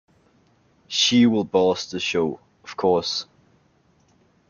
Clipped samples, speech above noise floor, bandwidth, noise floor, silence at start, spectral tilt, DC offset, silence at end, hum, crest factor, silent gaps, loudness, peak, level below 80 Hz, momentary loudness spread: under 0.1%; 41 dB; 7.2 kHz; -61 dBFS; 0.9 s; -4 dB/octave; under 0.1%; 1.25 s; none; 18 dB; none; -21 LUFS; -6 dBFS; -64 dBFS; 15 LU